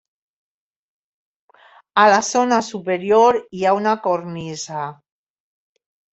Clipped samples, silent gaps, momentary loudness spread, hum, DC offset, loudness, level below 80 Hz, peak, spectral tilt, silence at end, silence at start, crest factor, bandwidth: under 0.1%; none; 14 LU; none; under 0.1%; -18 LUFS; -64 dBFS; -2 dBFS; -4 dB/octave; 1.2 s; 1.95 s; 18 dB; 8.2 kHz